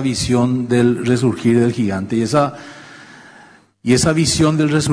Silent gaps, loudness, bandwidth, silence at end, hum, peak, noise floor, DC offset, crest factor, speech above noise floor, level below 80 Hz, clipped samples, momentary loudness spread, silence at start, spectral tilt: none; -16 LUFS; 11 kHz; 0 s; none; -4 dBFS; -46 dBFS; under 0.1%; 14 dB; 30 dB; -42 dBFS; under 0.1%; 7 LU; 0 s; -5.5 dB/octave